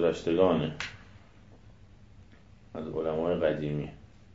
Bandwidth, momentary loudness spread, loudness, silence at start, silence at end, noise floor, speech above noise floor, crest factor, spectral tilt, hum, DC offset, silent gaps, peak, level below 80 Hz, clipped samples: 7.8 kHz; 17 LU; -30 LUFS; 0 s; 0.3 s; -55 dBFS; 27 dB; 22 dB; -7 dB/octave; none; 0.1%; none; -10 dBFS; -56 dBFS; under 0.1%